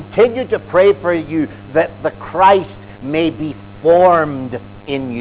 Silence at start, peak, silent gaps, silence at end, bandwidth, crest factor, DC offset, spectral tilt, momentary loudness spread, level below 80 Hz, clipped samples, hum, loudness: 0 s; 0 dBFS; none; 0 s; 4 kHz; 14 dB; under 0.1%; -10 dB/octave; 15 LU; -44 dBFS; under 0.1%; none; -15 LUFS